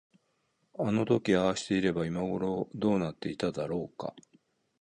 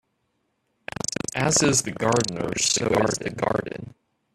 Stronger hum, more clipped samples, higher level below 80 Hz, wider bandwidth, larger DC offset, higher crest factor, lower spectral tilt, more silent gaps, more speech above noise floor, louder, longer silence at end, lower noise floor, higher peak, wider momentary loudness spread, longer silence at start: neither; neither; second, -60 dBFS vs -54 dBFS; second, 10 kHz vs 14.5 kHz; neither; about the same, 18 dB vs 20 dB; first, -6 dB/octave vs -3 dB/octave; neither; second, 45 dB vs 50 dB; second, -31 LUFS vs -23 LUFS; first, 0.6 s vs 0.45 s; about the same, -75 dBFS vs -73 dBFS; second, -12 dBFS vs -6 dBFS; second, 10 LU vs 16 LU; second, 0.8 s vs 1.1 s